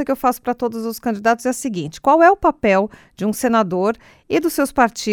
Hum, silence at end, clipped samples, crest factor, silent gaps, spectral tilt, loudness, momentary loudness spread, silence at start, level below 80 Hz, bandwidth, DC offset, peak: none; 0 s; under 0.1%; 18 dB; none; -5 dB/octave; -18 LUFS; 11 LU; 0 s; -48 dBFS; 19 kHz; under 0.1%; 0 dBFS